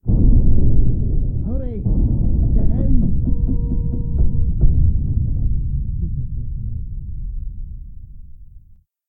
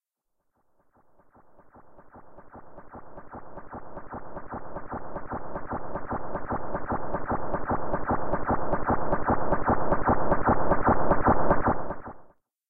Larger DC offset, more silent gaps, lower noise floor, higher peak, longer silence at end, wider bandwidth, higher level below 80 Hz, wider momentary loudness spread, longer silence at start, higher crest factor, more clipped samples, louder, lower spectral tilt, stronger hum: second, under 0.1% vs 2%; neither; second, -48 dBFS vs -78 dBFS; first, -2 dBFS vs -10 dBFS; first, 0.5 s vs 0 s; second, 1 kHz vs 2.7 kHz; first, -18 dBFS vs -40 dBFS; second, 14 LU vs 21 LU; about the same, 0.05 s vs 0 s; about the same, 14 dB vs 18 dB; neither; first, -21 LUFS vs -28 LUFS; first, -15.5 dB/octave vs -12 dB/octave; neither